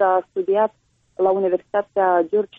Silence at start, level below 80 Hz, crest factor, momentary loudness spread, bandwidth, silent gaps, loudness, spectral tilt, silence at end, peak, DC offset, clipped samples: 0 s; -68 dBFS; 12 dB; 5 LU; 3.8 kHz; none; -20 LUFS; -8.5 dB/octave; 0.15 s; -8 dBFS; under 0.1%; under 0.1%